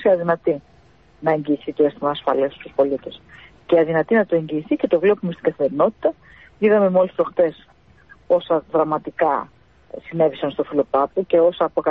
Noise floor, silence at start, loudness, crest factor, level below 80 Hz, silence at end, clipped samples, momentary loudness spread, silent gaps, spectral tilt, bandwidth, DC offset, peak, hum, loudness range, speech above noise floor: -52 dBFS; 0 s; -20 LUFS; 16 dB; -58 dBFS; 0 s; under 0.1%; 7 LU; none; -9.5 dB/octave; 4.5 kHz; 0.1%; -4 dBFS; none; 3 LU; 33 dB